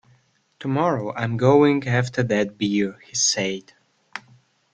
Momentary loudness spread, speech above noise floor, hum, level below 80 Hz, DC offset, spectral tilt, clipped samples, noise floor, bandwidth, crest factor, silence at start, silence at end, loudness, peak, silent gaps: 19 LU; 40 dB; none; -60 dBFS; under 0.1%; -4.5 dB/octave; under 0.1%; -61 dBFS; 10 kHz; 20 dB; 0.6 s; 0.55 s; -21 LUFS; -2 dBFS; none